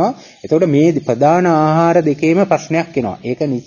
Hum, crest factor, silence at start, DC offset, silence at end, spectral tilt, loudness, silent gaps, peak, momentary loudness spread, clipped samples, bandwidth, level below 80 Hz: none; 14 dB; 0 s; under 0.1%; 0.05 s; -7.5 dB/octave; -14 LUFS; none; 0 dBFS; 9 LU; under 0.1%; 7.2 kHz; -54 dBFS